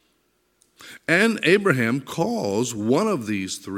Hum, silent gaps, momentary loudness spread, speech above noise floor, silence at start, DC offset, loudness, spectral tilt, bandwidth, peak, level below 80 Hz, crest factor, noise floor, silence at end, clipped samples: none; none; 8 LU; 46 dB; 0.8 s; under 0.1%; -21 LUFS; -5 dB/octave; 16.5 kHz; -4 dBFS; -66 dBFS; 20 dB; -67 dBFS; 0 s; under 0.1%